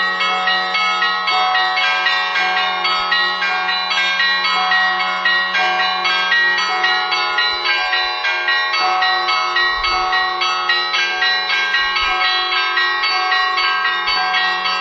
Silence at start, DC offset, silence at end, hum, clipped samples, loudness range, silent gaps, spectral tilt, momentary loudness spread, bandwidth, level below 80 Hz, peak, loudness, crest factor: 0 s; under 0.1%; 0 s; none; under 0.1%; 1 LU; none; -0.5 dB/octave; 2 LU; 7.8 kHz; -50 dBFS; -2 dBFS; -15 LUFS; 14 dB